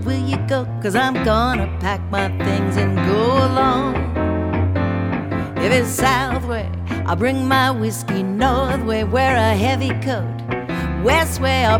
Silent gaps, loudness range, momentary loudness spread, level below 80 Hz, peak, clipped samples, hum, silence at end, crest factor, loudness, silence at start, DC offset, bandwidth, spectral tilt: none; 1 LU; 7 LU; -32 dBFS; -2 dBFS; under 0.1%; none; 0 s; 16 dB; -19 LUFS; 0 s; under 0.1%; 17.5 kHz; -5.5 dB/octave